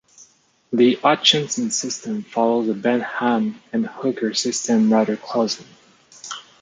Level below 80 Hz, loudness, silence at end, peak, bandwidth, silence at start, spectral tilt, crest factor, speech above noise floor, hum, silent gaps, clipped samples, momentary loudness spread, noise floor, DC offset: -70 dBFS; -20 LUFS; 0.2 s; -2 dBFS; 9.4 kHz; 0.2 s; -3.5 dB/octave; 20 dB; 35 dB; none; none; under 0.1%; 11 LU; -55 dBFS; under 0.1%